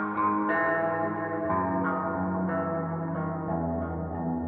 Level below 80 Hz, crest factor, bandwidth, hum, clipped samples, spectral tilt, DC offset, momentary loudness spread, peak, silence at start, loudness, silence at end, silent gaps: -52 dBFS; 14 dB; 4.1 kHz; none; under 0.1%; -11.5 dB/octave; under 0.1%; 6 LU; -14 dBFS; 0 s; -29 LUFS; 0 s; none